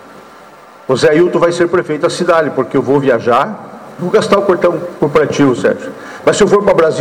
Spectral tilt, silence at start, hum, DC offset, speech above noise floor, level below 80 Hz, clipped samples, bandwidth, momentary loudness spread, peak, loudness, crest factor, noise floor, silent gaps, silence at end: -5.5 dB/octave; 0.1 s; none; under 0.1%; 26 dB; -46 dBFS; under 0.1%; 13 kHz; 10 LU; -2 dBFS; -12 LUFS; 10 dB; -37 dBFS; none; 0 s